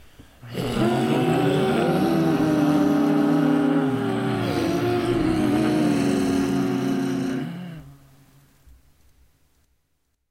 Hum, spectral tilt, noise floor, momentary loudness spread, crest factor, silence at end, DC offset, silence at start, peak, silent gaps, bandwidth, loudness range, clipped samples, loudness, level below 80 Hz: none; -6.5 dB/octave; -71 dBFS; 8 LU; 14 dB; 2.4 s; under 0.1%; 0.2 s; -8 dBFS; none; 16 kHz; 9 LU; under 0.1%; -22 LUFS; -48 dBFS